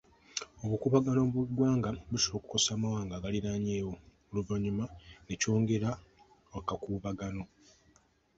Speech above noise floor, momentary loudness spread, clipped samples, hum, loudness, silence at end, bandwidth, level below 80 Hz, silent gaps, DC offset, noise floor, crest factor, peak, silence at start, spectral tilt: 35 dB; 13 LU; under 0.1%; none; -33 LUFS; 0.95 s; 8.2 kHz; -56 dBFS; none; under 0.1%; -67 dBFS; 20 dB; -12 dBFS; 0.35 s; -5 dB/octave